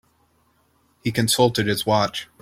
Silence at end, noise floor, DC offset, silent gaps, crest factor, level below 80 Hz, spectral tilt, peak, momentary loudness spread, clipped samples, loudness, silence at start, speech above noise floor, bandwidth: 0.15 s; -63 dBFS; under 0.1%; none; 20 dB; -54 dBFS; -4 dB/octave; -2 dBFS; 8 LU; under 0.1%; -21 LUFS; 1.05 s; 43 dB; 16.5 kHz